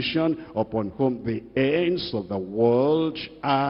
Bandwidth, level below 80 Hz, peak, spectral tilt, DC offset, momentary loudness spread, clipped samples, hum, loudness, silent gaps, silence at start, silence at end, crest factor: 5.8 kHz; -56 dBFS; -8 dBFS; -10 dB/octave; under 0.1%; 8 LU; under 0.1%; none; -25 LUFS; none; 0 s; 0 s; 16 dB